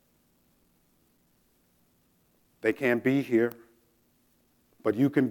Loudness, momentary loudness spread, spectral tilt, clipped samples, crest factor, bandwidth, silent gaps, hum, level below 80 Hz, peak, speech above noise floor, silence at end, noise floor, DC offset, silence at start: -27 LUFS; 7 LU; -7.5 dB/octave; under 0.1%; 20 dB; 17.5 kHz; none; none; -76 dBFS; -12 dBFS; 42 dB; 0 s; -68 dBFS; under 0.1%; 2.65 s